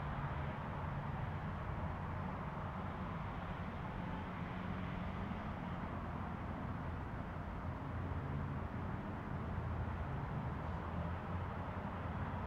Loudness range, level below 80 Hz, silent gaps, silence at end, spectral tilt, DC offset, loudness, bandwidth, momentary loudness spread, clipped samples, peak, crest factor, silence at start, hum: 1 LU; -52 dBFS; none; 0 s; -8.5 dB/octave; under 0.1%; -44 LUFS; 7.4 kHz; 2 LU; under 0.1%; -30 dBFS; 14 dB; 0 s; none